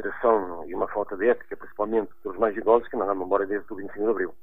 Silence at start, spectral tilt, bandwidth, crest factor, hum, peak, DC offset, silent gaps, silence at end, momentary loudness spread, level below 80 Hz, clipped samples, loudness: 0 s; -9 dB/octave; 3.9 kHz; 20 dB; none; -6 dBFS; 1%; none; 0 s; 9 LU; -56 dBFS; under 0.1%; -26 LUFS